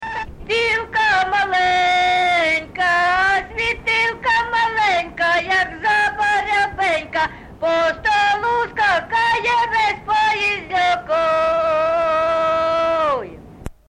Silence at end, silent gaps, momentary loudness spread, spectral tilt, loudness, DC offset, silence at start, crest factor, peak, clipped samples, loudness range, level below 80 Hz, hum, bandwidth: 0.15 s; none; 5 LU; -3 dB/octave; -17 LUFS; under 0.1%; 0 s; 10 dB; -8 dBFS; under 0.1%; 2 LU; -44 dBFS; none; 11.5 kHz